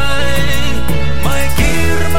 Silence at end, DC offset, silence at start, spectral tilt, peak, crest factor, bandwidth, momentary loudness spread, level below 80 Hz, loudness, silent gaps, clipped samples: 0 s; 40%; 0 s; -4.5 dB/octave; -2 dBFS; 14 dB; 17 kHz; 3 LU; -20 dBFS; -16 LUFS; none; under 0.1%